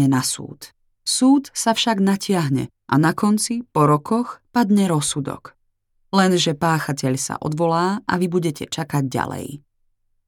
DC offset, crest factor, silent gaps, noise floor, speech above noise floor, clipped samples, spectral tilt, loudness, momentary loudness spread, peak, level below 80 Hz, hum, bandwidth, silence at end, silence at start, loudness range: under 0.1%; 18 dB; none; -66 dBFS; 47 dB; under 0.1%; -5 dB/octave; -20 LUFS; 10 LU; -2 dBFS; -58 dBFS; none; 18 kHz; 0.7 s; 0 s; 3 LU